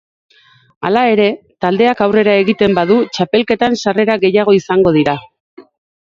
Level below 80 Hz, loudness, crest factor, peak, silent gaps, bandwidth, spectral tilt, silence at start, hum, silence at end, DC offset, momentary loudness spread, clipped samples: -50 dBFS; -13 LUFS; 14 dB; 0 dBFS; 5.40-5.57 s; 7.6 kHz; -6 dB/octave; 0.8 s; none; 0.5 s; under 0.1%; 6 LU; under 0.1%